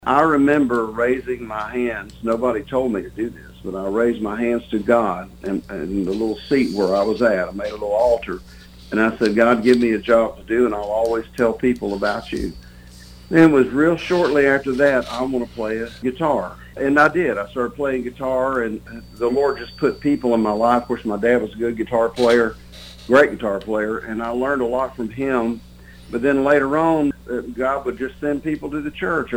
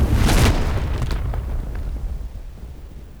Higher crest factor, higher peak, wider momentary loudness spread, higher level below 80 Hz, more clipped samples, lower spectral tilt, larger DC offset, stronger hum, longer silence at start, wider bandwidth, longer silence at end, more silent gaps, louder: first, 18 dB vs 12 dB; first, -2 dBFS vs -8 dBFS; second, 11 LU vs 21 LU; second, -44 dBFS vs -22 dBFS; neither; about the same, -6.5 dB/octave vs -5.5 dB/octave; second, under 0.1% vs 0.5%; first, 60 Hz at -45 dBFS vs none; about the same, 0.05 s vs 0 s; second, 17.5 kHz vs 20 kHz; about the same, 0 s vs 0 s; neither; about the same, -20 LUFS vs -22 LUFS